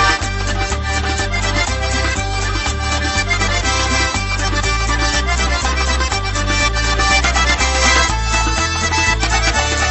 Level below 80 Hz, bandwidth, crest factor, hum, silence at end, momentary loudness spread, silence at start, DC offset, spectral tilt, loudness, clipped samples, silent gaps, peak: -20 dBFS; 8.6 kHz; 16 dB; none; 0 s; 5 LU; 0 s; under 0.1%; -3 dB/octave; -16 LUFS; under 0.1%; none; 0 dBFS